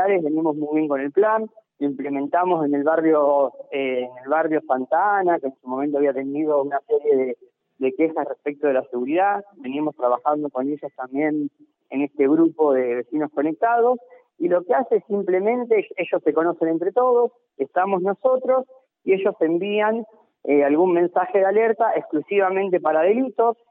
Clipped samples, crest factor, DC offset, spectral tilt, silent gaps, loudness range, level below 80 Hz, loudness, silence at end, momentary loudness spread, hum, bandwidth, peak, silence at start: under 0.1%; 14 dB; under 0.1%; -10.5 dB/octave; none; 3 LU; -78 dBFS; -21 LUFS; 0.2 s; 9 LU; none; 3.8 kHz; -6 dBFS; 0 s